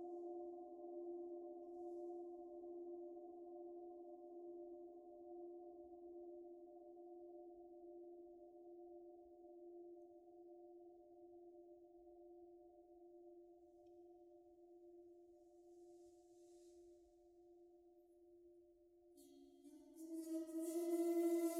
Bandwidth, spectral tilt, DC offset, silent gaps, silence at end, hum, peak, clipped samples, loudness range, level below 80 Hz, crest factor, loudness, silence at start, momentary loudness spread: 16.5 kHz; -4 dB/octave; under 0.1%; none; 0 s; none; -32 dBFS; under 0.1%; 14 LU; under -90 dBFS; 20 dB; -52 LUFS; 0 s; 18 LU